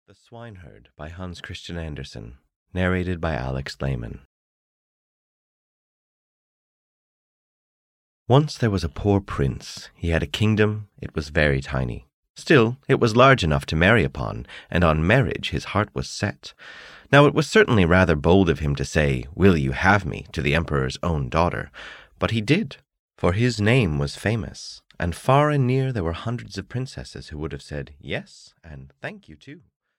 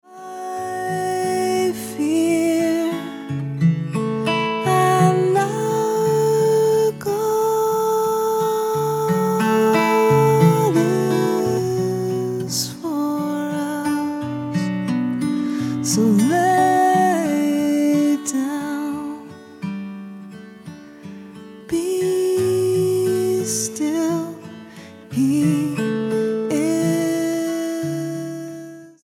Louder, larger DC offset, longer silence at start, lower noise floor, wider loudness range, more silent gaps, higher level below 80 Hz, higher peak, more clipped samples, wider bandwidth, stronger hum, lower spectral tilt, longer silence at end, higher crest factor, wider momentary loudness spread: about the same, -21 LUFS vs -20 LUFS; neither; first, 0.3 s vs 0.1 s; first, under -90 dBFS vs -40 dBFS; first, 11 LU vs 6 LU; first, 2.56-2.66 s, 4.25-8.26 s, 12.14-12.23 s, 12.30-12.35 s, 22.99-23.09 s vs none; first, -38 dBFS vs -64 dBFS; about the same, -4 dBFS vs -2 dBFS; neither; second, 12.5 kHz vs 17.5 kHz; neither; about the same, -6.5 dB/octave vs -5.5 dB/octave; first, 0.4 s vs 0.15 s; about the same, 20 dB vs 16 dB; first, 19 LU vs 16 LU